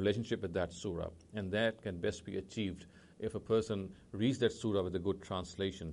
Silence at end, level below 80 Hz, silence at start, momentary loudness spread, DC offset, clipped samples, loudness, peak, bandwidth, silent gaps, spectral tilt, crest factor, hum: 0 s; -60 dBFS; 0 s; 9 LU; under 0.1%; under 0.1%; -37 LUFS; -18 dBFS; 11.5 kHz; none; -6 dB/octave; 18 dB; none